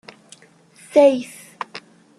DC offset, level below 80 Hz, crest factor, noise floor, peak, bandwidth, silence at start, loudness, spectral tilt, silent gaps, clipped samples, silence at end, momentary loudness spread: under 0.1%; -72 dBFS; 20 dB; -50 dBFS; -2 dBFS; 12.5 kHz; 0.95 s; -17 LUFS; -4 dB/octave; none; under 0.1%; 0.4 s; 22 LU